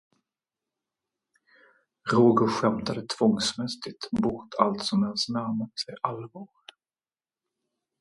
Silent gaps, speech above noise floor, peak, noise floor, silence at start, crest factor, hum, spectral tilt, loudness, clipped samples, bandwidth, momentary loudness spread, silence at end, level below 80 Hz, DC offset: none; over 64 dB; -4 dBFS; under -90 dBFS; 2.05 s; 24 dB; none; -5.5 dB/octave; -26 LUFS; under 0.1%; 11.5 kHz; 15 LU; 1.55 s; -62 dBFS; under 0.1%